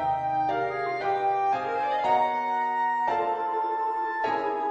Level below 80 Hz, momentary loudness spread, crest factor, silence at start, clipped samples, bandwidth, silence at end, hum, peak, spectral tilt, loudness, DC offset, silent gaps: -64 dBFS; 4 LU; 14 dB; 0 s; under 0.1%; 8 kHz; 0 s; none; -12 dBFS; -5.5 dB/octave; -26 LUFS; under 0.1%; none